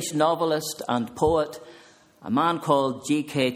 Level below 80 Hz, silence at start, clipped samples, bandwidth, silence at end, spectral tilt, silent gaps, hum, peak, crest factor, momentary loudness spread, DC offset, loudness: -52 dBFS; 0 s; under 0.1%; 16 kHz; 0 s; -5 dB/octave; none; none; -6 dBFS; 18 dB; 6 LU; under 0.1%; -24 LUFS